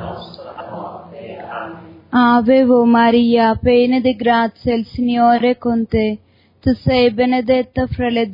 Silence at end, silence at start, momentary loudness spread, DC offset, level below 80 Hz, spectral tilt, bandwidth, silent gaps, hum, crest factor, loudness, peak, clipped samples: 0 s; 0 s; 19 LU; under 0.1%; -42 dBFS; -9 dB/octave; 5.4 kHz; none; none; 14 dB; -15 LUFS; -2 dBFS; under 0.1%